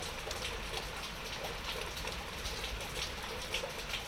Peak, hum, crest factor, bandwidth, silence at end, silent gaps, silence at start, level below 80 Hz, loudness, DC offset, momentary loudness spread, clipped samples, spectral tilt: -22 dBFS; none; 18 dB; 16 kHz; 0 s; none; 0 s; -48 dBFS; -39 LUFS; under 0.1%; 3 LU; under 0.1%; -2.5 dB/octave